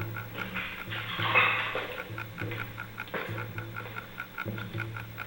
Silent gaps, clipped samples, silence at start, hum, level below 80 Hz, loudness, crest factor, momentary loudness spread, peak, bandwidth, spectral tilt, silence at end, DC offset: none; under 0.1%; 0 s; none; -58 dBFS; -32 LUFS; 22 dB; 15 LU; -10 dBFS; 16.5 kHz; -5 dB/octave; 0 s; under 0.1%